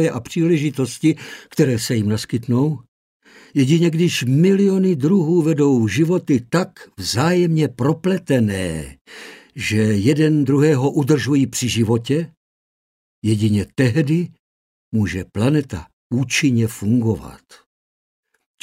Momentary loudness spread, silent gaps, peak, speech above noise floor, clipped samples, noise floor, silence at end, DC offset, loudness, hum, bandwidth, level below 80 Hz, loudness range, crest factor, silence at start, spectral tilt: 11 LU; 2.88-3.20 s, 9.01-9.05 s, 12.37-13.22 s, 14.39-14.92 s, 15.93-16.10 s; -4 dBFS; over 72 dB; under 0.1%; under -90 dBFS; 1.25 s; under 0.1%; -18 LUFS; none; 16 kHz; -50 dBFS; 4 LU; 16 dB; 0 s; -6 dB/octave